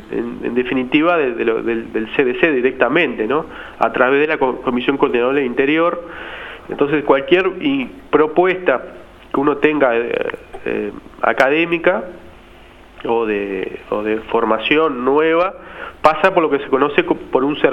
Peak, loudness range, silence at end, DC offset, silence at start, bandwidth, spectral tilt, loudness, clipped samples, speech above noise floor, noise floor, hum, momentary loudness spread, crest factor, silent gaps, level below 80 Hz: 0 dBFS; 3 LU; 0 s; under 0.1%; 0 s; 8.6 kHz; -6.5 dB/octave; -17 LUFS; under 0.1%; 25 dB; -42 dBFS; none; 10 LU; 16 dB; none; -48 dBFS